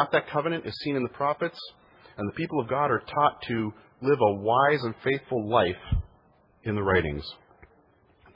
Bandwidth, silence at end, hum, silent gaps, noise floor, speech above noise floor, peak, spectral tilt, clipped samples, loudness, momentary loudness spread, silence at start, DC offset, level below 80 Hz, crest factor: 5.6 kHz; 1 s; none; none; -62 dBFS; 35 dB; -8 dBFS; -8.5 dB/octave; under 0.1%; -27 LUFS; 12 LU; 0 s; under 0.1%; -46 dBFS; 20 dB